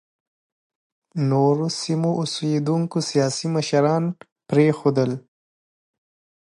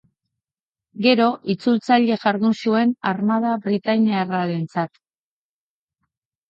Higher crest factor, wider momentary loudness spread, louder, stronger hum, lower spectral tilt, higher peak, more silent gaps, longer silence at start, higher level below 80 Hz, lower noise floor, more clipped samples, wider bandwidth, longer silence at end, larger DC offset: about the same, 18 dB vs 18 dB; about the same, 7 LU vs 7 LU; about the same, -21 LUFS vs -20 LUFS; neither; about the same, -6 dB/octave vs -7 dB/octave; about the same, -4 dBFS vs -4 dBFS; first, 4.32-4.36 s vs none; first, 1.15 s vs 0.95 s; about the same, -68 dBFS vs -70 dBFS; about the same, under -90 dBFS vs under -90 dBFS; neither; first, 11.5 kHz vs 7.6 kHz; second, 1.25 s vs 1.6 s; neither